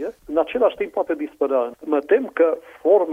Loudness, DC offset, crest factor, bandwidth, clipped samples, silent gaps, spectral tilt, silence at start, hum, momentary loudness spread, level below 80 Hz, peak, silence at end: -21 LUFS; under 0.1%; 16 dB; 3.8 kHz; under 0.1%; none; -6 dB/octave; 0 s; none; 7 LU; -60 dBFS; -4 dBFS; 0 s